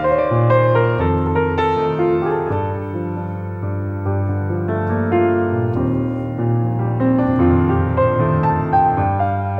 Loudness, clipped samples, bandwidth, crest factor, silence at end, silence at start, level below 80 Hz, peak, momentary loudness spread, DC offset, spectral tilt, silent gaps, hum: -18 LUFS; under 0.1%; 4.8 kHz; 14 dB; 0 s; 0 s; -38 dBFS; -4 dBFS; 9 LU; under 0.1%; -10.5 dB/octave; none; none